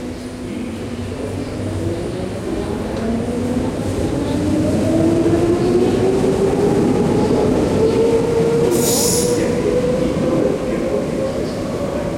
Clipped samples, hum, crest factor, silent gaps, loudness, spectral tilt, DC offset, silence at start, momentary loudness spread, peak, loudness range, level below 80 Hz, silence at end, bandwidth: under 0.1%; none; 12 dB; none; -18 LUFS; -5.5 dB/octave; under 0.1%; 0 s; 10 LU; -4 dBFS; 7 LU; -36 dBFS; 0 s; 16.5 kHz